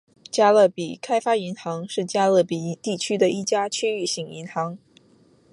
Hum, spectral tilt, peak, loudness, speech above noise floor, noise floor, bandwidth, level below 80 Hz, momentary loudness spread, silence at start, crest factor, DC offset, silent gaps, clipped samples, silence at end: none; -4 dB/octave; -6 dBFS; -23 LUFS; 35 dB; -57 dBFS; 11.5 kHz; -72 dBFS; 12 LU; 0.35 s; 16 dB; under 0.1%; none; under 0.1%; 0.75 s